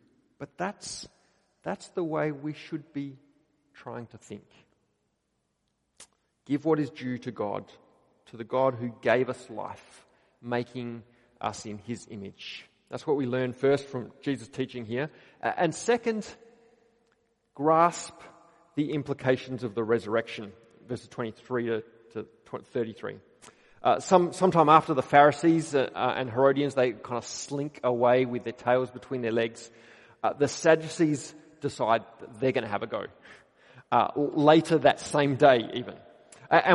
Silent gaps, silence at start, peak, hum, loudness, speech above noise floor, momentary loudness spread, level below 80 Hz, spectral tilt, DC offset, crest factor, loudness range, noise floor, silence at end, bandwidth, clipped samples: none; 0.4 s; -4 dBFS; none; -27 LUFS; 50 dB; 20 LU; -70 dBFS; -5.5 dB/octave; under 0.1%; 24 dB; 13 LU; -77 dBFS; 0 s; 11.5 kHz; under 0.1%